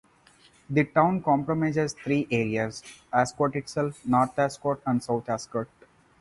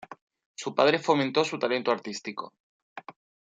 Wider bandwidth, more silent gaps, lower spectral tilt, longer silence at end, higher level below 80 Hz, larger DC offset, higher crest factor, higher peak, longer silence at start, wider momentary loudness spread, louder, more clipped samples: first, 11.5 kHz vs 9.2 kHz; second, none vs 0.21-0.27 s, 0.46-0.54 s, 2.60-2.96 s; first, -6.5 dB/octave vs -4.5 dB/octave; first, 0.55 s vs 0.4 s; first, -60 dBFS vs -78 dBFS; neither; about the same, 20 dB vs 24 dB; about the same, -6 dBFS vs -6 dBFS; first, 0.7 s vs 0 s; second, 8 LU vs 23 LU; about the same, -26 LUFS vs -27 LUFS; neither